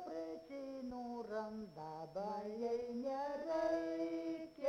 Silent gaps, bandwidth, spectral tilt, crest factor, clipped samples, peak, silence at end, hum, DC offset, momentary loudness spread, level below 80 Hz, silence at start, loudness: none; 11.5 kHz; -6.5 dB/octave; 16 dB; under 0.1%; -28 dBFS; 0 s; none; under 0.1%; 10 LU; -74 dBFS; 0 s; -43 LUFS